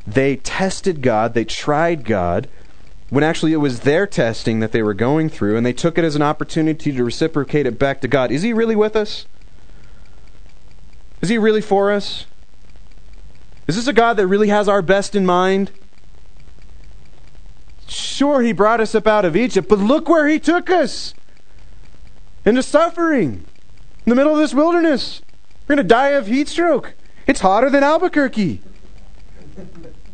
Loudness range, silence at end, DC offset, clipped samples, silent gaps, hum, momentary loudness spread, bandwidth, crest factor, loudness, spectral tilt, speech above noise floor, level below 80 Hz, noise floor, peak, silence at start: 5 LU; 0.2 s; 4%; under 0.1%; none; none; 9 LU; 9.4 kHz; 18 dB; -17 LUFS; -5.5 dB/octave; 29 dB; -42 dBFS; -45 dBFS; 0 dBFS; 0.05 s